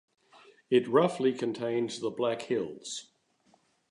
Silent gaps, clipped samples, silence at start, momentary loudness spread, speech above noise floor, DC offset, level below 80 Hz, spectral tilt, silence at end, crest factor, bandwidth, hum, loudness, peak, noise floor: none; under 0.1%; 0.7 s; 13 LU; 39 dB; under 0.1%; -78 dBFS; -5 dB/octave; 0.9 s; 22 dB; 11 kHz; none; -30 LUFS; -10 dBFS; -68 dBFS